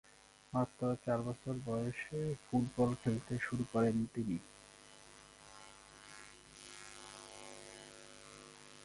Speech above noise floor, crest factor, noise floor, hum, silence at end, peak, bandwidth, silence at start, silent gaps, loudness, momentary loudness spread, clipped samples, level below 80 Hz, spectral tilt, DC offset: 22 dB; 20 dB; -59 dBFS; 50 Hz at -70 dBFS; 0 s; -20 dBFS; 11.5 kHz; 0.5 s; none; -38 LUFS; 22 LU; under 0.1%; -66 dBFS; -6.5 dB/octave; under 0.1%